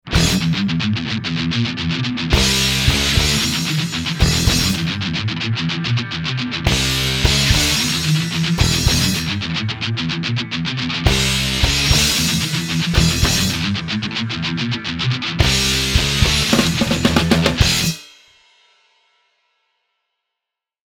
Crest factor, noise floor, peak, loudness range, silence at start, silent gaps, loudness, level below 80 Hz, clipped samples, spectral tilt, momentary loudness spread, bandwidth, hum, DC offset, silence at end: 18 dB; -84 dBFS; 0 dBFS; 3 LU; 0.05 s; none; -17 LUFS; -28 dBFS; under 0.1%; -3.5 dB/octave; 7 LU; 19.5 kHz; none; under 0.1%; 2.85 s